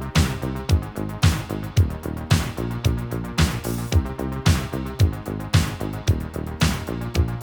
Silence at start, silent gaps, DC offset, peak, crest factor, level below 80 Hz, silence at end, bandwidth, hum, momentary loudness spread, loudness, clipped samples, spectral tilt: 0 s; none; 0.1%; -4 dBFS; 18 dB; -30 dBFS; 0 s; over 20 kHz; none; 6 LU; -24 LUFS; under 0.1%; -5.5 dB/octave